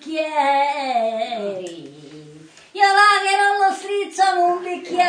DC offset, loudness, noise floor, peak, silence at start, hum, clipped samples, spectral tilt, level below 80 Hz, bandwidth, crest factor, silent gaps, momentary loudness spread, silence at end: under 0.1%; -18 LUFS; -44 dBFS; -2 dBFS; 0 s; none; under 0.1%; -2 dB/octave; -76 dBFS; 10 kHz; 16 dB; none; 15 LU; 0 s